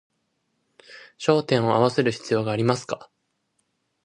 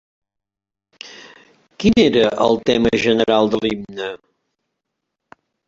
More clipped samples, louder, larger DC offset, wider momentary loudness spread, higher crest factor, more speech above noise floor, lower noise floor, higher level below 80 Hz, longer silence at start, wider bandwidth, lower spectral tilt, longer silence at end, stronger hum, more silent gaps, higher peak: neither; second, -23 LUFS vs -16 LUFS; neither; second, 8 LU vs 22 LU; about the same, 22 dB vs 20 dB; second, 51 dB vs 70 dB; second, -73 dBFS vs -86 dBFS; second, -64 dBFS vs -48 dBFS; second, 0.9 s vs 1.05 s; first, 10.5 kHz vs 7.8 kHz; about the same, -6 dB/octave vs -5.5 dB/octave; second, 1 s vs 1.5 s; neither; neither; second, -4 dBFS vs 0 dBFS